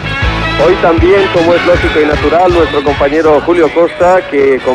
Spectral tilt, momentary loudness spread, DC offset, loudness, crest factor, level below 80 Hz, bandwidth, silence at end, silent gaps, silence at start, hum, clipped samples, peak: -6.5 dB/octave; 3 LU; under 0.1%; -9 LUFS; 8 dB; -24 dBFS; 10.5 kHz; 0 s; none; 0 s; none; under 0.1%; 0 dBFS